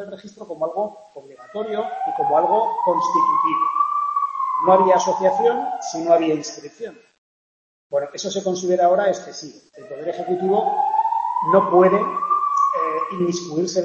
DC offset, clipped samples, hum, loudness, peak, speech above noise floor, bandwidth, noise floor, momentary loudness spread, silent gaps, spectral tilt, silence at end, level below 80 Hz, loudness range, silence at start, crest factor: under 0.1%; under 0.1%; none; -20 LUFS; -2 dBFS; over 70 dB; 8.2 kHz; under -90 dBFS; 16 LU; 7.18-7.90 s; -5 dB/octave; 0 s; -70 dBFS; 5 LU; 0 s; 20 dB